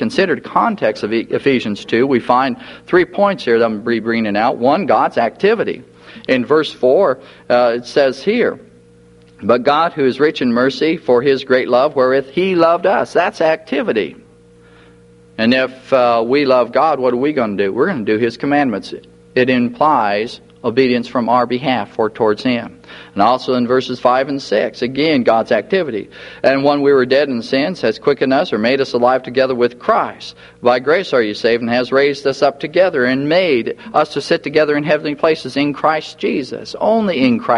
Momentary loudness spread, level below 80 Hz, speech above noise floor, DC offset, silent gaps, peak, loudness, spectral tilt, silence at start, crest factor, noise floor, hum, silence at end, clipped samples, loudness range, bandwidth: 6 LU; -56 dBFS; 30 dB; under 0.1%; none; 0 dBFS; -15 LUFS; -6 dB/octave; 0 s; 16 dB; -45 dBFS; none; 0 s; under 0.1%; 2 LU; 11 kHz